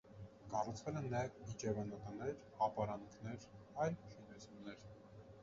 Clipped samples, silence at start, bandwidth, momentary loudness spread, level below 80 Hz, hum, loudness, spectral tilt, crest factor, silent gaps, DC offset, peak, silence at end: under 0.1%; 0.05 s; 7.4 kHz; 16 LU; -68 dBFS; none; -45 LUFS; -6.5 dB/octave; 20 dB; none; under 0.1%; -24 dBFS; 0 s